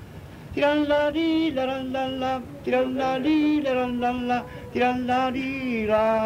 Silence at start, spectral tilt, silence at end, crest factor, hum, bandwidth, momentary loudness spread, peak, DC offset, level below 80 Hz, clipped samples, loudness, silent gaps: 0 s; -6 dB/octave; 0 s; 14 dB; none; 15.5 kHz; 7 LU; -10 dBFS; under 0.1%; -50 dBFS; under 0.1%; -24 LUFS; none